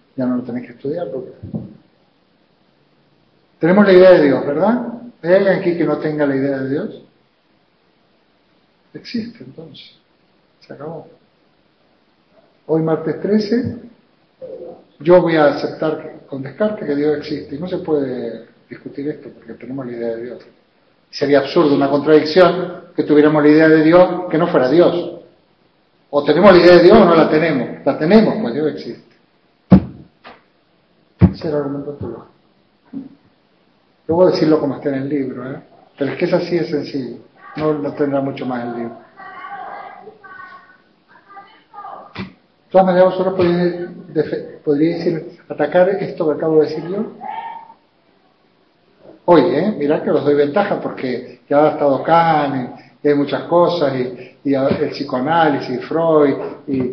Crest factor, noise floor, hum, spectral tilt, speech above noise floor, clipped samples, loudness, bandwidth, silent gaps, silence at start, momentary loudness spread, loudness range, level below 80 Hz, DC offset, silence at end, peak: 16 dB; -58 dBFS; none; -8.5 dB/octave; 43 dB; under 0.1%; -15 LUFS; 6.2 kHz; none; 0.15 s; 22 LU; 15 LU; -46 dBFS; under 0.1%; 0 s; 0 dBFS